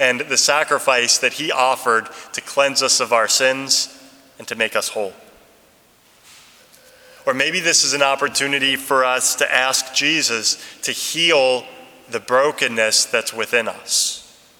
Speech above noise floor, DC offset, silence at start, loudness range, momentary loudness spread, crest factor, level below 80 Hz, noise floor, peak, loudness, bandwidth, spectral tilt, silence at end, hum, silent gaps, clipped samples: 35 dB; under 0.1%; 0 s; 7 LU; 10 LU; 20 dB; -68 dBFS; -53 dBFS; 0 dBFS; -17 LUFS; 19.5 kHz; -0.5 dB/octave; 0.35 s; none; none; under 0.1%